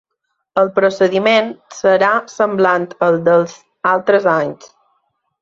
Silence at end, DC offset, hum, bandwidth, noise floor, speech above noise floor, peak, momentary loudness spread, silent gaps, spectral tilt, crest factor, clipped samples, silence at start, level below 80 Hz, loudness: 0.85 s; under 0.1%; none; 7.6 kHz; -72 dBFS; 58 dB; -2 dBFS; 8 LU; none; -5.5 dB/octave; 14 dB; under 0.1%; 0.55 s; -62 dBFS; -15 LUFS